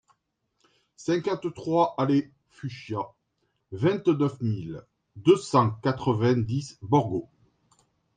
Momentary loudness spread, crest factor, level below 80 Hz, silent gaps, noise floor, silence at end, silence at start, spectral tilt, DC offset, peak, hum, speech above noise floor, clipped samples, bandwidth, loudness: 16 LU; 20 dB; -62 dBFS; none; -75 dBFS; 0.95 s; 1 s; -7.5 dB/octave; under 0.1%; -6 dBFS; none; 50 dB; under 0.1%; 9.4 kHz; -26 LUFS